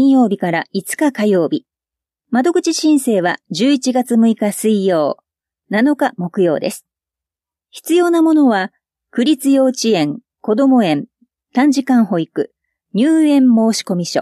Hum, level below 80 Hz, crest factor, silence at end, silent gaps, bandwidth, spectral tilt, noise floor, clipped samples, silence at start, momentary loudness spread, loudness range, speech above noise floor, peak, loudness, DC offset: none; -72 dBFS; 12 dB; 0 s; none; 14.5 kHz; -5 dB/octave; -88 dBFS; under 0.1%; 0 s; 10 LU; 2 LU; 74 dB; -4 dBFS; -15 LUFS; under 0.1%